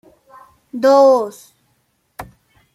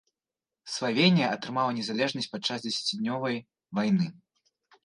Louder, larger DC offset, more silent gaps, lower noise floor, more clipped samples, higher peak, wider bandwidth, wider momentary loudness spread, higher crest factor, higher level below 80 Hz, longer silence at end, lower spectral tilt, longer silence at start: first, -13 LUFS vs -28 LUFS; neither; neither; second, -64 dBFS vs under -90 dBFS; neither; first, -2 dBFS vs -8 dBFS; first, 14 kHz vs 11 kHz; first, 26 LU vs 11 LU; second, 16 dB vs 22 dB; first, -56 dBFS vs -76 dBFS; second, 0.5 s vs 0.7 s; about the same, -4.5 dB/octave vs -5 dB/octave; about the same, 0.75 s vs 0.65 s